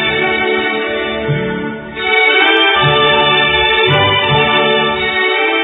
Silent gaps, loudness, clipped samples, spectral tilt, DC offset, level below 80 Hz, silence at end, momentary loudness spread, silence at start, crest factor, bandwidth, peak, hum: none; -11 LUFS; under 0.1%; -8 dB/octave; under 0.1%; -40 dBFS; 0 s; 9 LU; 0 s; 12 dB; 4 kHz; 0 dBFS; none